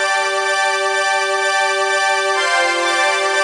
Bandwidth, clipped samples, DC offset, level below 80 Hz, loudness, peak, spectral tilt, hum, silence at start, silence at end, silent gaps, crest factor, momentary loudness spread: 11.5 kHz; under 0.1%; under 0.1%; -80 dBFS; -15 LUFS; -4 dBFS; 1.5 dB/octave; none; 0 s; 0 s; none; 14 dB; 1 LU